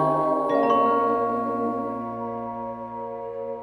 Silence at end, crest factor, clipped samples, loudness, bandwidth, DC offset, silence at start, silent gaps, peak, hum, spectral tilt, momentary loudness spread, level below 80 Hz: 0 s; 16 dB; under 0.1%; -25 LUFS; 11 kHz; under 0.1%; 0 s; none; -10 dBFS; 60 Hz at -55 dBFS; -8 dB/octave; 13 LU; -62 dBFS